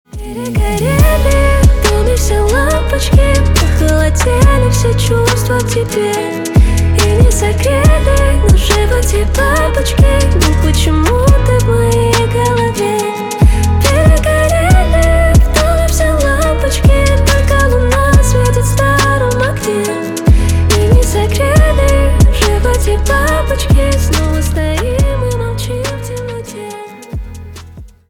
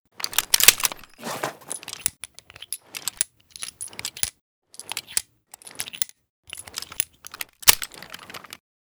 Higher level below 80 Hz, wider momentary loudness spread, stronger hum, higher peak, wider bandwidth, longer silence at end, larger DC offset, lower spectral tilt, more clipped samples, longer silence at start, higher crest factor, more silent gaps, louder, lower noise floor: first, -14 dBFS vs -54 dBFS; second, 7 LU vs 24 LU; neither; about the same, 0 dBFS vs 0 dBFS; about the same, 19 kHz vs over 20 kHz; second, 0.25 s vs 0.45 s; neither; first, -5.5 dB/octave vs 1.5 dB/octave; neither; about the same, 0.15 s vs 0.2 s; second, 10 dB vs 28 dB; second, none vs 4.41-4.62 s, 6.30-6.43 s; first, -11 LUFS vs -22 LUFS; second, -33 dBFS vs -48 dBFS